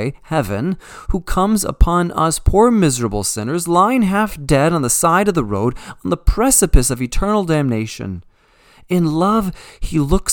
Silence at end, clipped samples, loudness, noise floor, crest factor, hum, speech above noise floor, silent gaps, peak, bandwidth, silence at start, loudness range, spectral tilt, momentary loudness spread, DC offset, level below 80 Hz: 0 s; under 0.1%; -16 LUFS; -51 dBFS; 16 dB; none; 35 dB; none; 0 dBFS; 19 kHz; 0 s; 3 LU; -5 dB/octave; 11 LU; under 0.1%; -24 dBFS